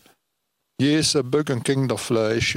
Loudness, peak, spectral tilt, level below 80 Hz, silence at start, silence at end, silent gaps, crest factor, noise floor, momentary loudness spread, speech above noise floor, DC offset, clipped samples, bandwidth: -21 LUFS; -10 dBFS; -4.5 dB/octave; -52 dBFS; 0.8 s; 0 s; none; 14 dB; -77 dBFS; 4 LU; 56 dB; under 0.1%; under 0.1%; 16 kHz